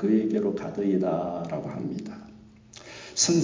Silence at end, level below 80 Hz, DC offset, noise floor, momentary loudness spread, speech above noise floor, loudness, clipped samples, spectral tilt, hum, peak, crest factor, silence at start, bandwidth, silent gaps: 0 s; -62 dBFS; under 0.1%; -50 dBFS; 20 LU; 23 dB; -27 LUFS; under 0.1%; -4.5 dB/octave; none; -8 dBFS; 20 dB; 0 s; 7.6 kHz; none